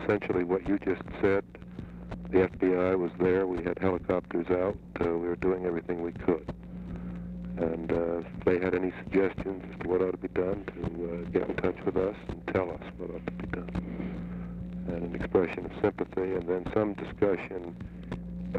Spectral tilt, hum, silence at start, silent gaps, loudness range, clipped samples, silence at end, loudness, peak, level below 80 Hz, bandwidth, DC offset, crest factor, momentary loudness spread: -9 dB/octave; none; 0 s; none; 4 LU; under 0.1%; 0 s; -31 LUFS; -12 dBFS; -48 dBFS; 7 kHz; under 0.1%; 18 dB; 12 LU